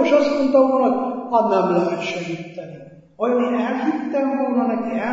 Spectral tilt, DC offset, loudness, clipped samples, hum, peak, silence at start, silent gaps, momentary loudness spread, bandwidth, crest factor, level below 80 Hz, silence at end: -6.5 dB/octave; under 0.1%; -20 LUFS; under 0.1%; none; -4 dBFS; 0 s; none; 12 LU; 7.8 kHz; 16 dB; -64 dBFS; 0 s